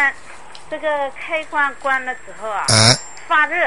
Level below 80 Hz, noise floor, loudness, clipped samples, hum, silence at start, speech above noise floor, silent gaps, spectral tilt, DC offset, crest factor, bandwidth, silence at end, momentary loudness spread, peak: -48 dBFS; -40 dBFS; -17 LUFS; under 0.1%; 50 Hz at -55 dBFS; 0 s; 22 dB; none; -2.5 dB/octave; 2%; 20 dB; 11.5 kHz; 0 s; 17 LU; 0 dBFS